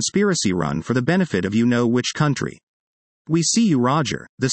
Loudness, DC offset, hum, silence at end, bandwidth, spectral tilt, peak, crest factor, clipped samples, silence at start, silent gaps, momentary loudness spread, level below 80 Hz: -20 LUFS; under 0.1%; none; 0 s; 8.8 kHz; -4.5 dB/octave; -6 dBFS; 14 dB; under 0.1%; 0 s; 2.63-3.25 s, 4.29-4.38 s; 7 LU; -54 dBFS